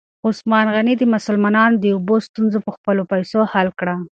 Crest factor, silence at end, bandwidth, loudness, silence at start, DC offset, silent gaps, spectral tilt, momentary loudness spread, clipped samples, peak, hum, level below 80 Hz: 16 dB; 0.05 s; 7.6 kHz; -17 LUFS; 0.25 s; under 0.1%; 2.29-2.34 s, 2.77-2.84 s; -7 dB/octave; 7 LU; under 0.1%; 0 dBFS; none; -62 dBFS